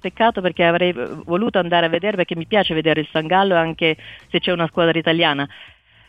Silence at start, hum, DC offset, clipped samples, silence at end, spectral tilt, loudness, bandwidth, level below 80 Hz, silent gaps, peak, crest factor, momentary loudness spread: 0.05 s; none; under 0.1%; under 0.1%; 0.4 s; -7.5 dB/octave; -18 LUFS; 8 kHz; -52 dBFS; none; -2 dBFS; 18 dB; 7 LU